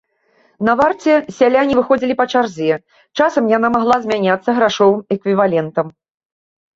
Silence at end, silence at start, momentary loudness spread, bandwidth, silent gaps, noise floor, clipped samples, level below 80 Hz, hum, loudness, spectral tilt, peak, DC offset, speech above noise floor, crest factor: 0.85 s; 0.6 s; 7 LU; 7.8 kHz; none; -57 dBFS; under 0.1%; -54 dBFS; none; -15 LUFS; -6 dB/octave; -2 dBFS; under 0.1%; 43 dB; 14 dB